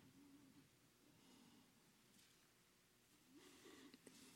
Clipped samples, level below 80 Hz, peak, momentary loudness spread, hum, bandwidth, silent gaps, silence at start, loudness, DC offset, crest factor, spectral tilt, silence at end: under 0.1%; under -90 dBFS; -46 dBFS; 5 LU; none; 16.5 kHz; none; 0 s; -66 LUFS; under 0.1%; 22 dB; -3 dB/octave; 0 s